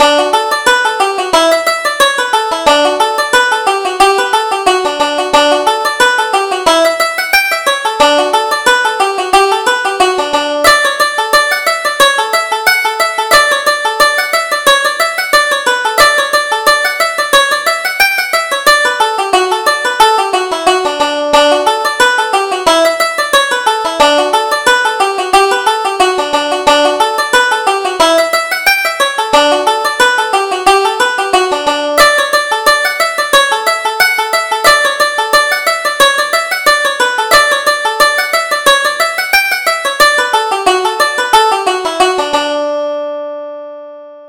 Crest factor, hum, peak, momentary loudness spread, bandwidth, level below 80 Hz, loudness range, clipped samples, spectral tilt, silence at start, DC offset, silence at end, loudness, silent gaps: 10 dB; none; 0 dBFS; 5 LU; over 20 kHz; -44 dBFS; 1 LU; 0.2%; -0.5 dB/octave; 0 s; under 0.1%; 0 s; -10 LUFS; none